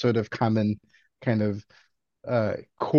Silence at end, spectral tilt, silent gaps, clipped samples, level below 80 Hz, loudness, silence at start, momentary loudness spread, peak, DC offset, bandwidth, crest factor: 0 s; -8.5 dB/octave; none; under 0.1%; -64 dBFS; -27 LUFS; 0 s; 11 LU; -8 dBFS; under 0.1%; 7 kHz; 18 dB